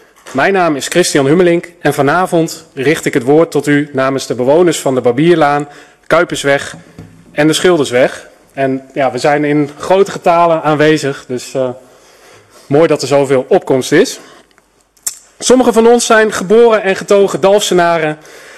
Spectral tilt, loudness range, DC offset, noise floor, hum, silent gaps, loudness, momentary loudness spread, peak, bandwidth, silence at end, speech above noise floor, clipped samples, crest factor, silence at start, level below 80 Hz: -4.5 dB/octave; 4 LU; under 0.1%; -51 dBFS; none; none; -11 LUFS; 10 LU; 0 dBFS; 14 kHz; 0.2 s; 40 dB; under 0.1%; 12 dB; 0.25 s; -50 dBFS